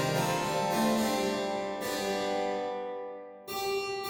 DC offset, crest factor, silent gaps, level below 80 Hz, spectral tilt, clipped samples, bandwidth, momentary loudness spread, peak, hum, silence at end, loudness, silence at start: under 0.1%; 14 dB; none; -64 dBFS; -4 dB/octave; under 0.1%; 18 kHz; 11 LU; -16 dBFS; none; 0 s; -31 LUFS; 0 s